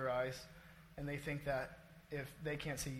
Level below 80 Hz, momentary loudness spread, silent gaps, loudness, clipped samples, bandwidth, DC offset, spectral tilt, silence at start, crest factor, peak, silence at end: -62 dBFS; 16 LU; none; -44 LUFS; under 0.1%; 16.5 kHz; under 0.1%; -5 dB/octave; 0 s; 18 dB; -26 dBFS; 0 s